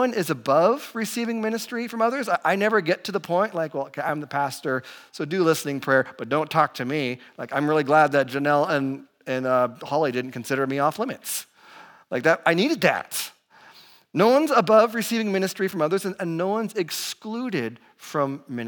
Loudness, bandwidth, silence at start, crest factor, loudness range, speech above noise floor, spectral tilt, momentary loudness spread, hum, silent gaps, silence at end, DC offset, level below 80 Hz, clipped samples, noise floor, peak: -23 LUFS; 19.5 kHz; 0 s; 20 dB; 4 LU; 28 dB; -4.5 dB/octave; 11 LU; none; none; 0 s; under 0.1%; -82 dBFS; under 0.1%; -52 dBFS; -4 dBFS